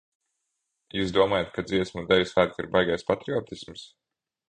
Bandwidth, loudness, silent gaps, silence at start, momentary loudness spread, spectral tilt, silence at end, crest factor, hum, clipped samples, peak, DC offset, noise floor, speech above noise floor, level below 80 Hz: 9.6 kHz; -26 LUFS; none; 0.95 s; 16 LU; -5.5 dB/octave; 0.65 s; 22 dB; none; under 0.1%; -6 dBFS; under 0.1%; -80 dBFS; 55 dB; -54 dBFS